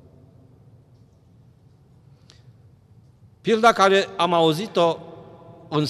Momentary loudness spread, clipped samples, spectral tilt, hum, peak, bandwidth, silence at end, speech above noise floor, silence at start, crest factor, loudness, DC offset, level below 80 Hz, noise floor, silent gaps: 15 LU; under 0.1%; -5 dB/octave; none; -4 dBFS; 14.5 kHz; 0 s; 35 dB; 3.45 s; 20 dB; -20 LUFS; under 0.1%; -64 dBFS; -53 dBFS; none